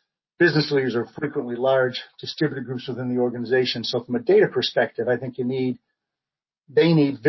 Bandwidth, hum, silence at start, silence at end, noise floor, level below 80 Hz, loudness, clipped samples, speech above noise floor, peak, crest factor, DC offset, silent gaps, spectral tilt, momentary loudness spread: 6 kHz; none; 0.4 s; 0 s; under -90 dBFS; -68 dBFS; -22 LUFS; under 0.1%; over 68 dB; -6 dBFS; 18 dB; under 0.1%; none; -7 dB/octave; 10 LU